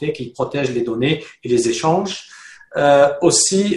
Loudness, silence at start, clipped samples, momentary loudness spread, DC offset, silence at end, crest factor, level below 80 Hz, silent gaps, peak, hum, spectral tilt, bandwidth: -17 LUFS; 0 s; under 0.1%; 12 LU; under 0.1%; 0 s; 16 dB; -54 dBFS; none; 0 dBFS; none; -4 dB/octave; 12 kHz